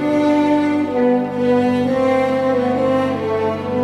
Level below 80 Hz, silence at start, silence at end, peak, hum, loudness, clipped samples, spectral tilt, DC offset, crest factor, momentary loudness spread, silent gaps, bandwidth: -52 dBFS; 0 s; 0 s; -6 dBFS; none; -17 LUFS; under 0.1%; -7 dB/octave; under 0.1%; 10 dB; 4 LU; none; 11 kHz